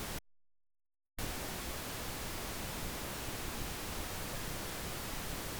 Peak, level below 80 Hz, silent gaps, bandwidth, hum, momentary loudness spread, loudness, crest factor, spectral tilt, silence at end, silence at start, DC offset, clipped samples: -26 dBFS; -48 dBFS; none; over 20 kHz; none; 1 LU; -41 LUFS; 16 dB; -3 dB/octave; 0 s; 0 s; under 0.1%; under 0.1%